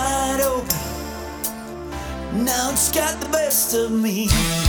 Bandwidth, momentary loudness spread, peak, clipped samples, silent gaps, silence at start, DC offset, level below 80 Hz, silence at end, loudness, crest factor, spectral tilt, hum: over 20 kHz; 13 LU; -2 dBFS; under 0.1%; none; 0 s; under 0.1%; -34 dBFS; 0 s; -21 LUFS; 18 dB; -3.5 dB/octave; none